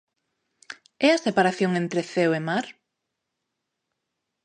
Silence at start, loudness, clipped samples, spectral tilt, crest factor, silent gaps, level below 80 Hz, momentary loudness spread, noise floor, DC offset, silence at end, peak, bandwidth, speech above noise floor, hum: 0.7 s; -23 LUFS; under 0.1%; -5.5 dB/octave; 22 dB; none; -76 dBFS; 22 LU; -81 dBFS; under 0.1%; 1.75 s; -6 dBFS; 9.8 kHz; 59 dB; none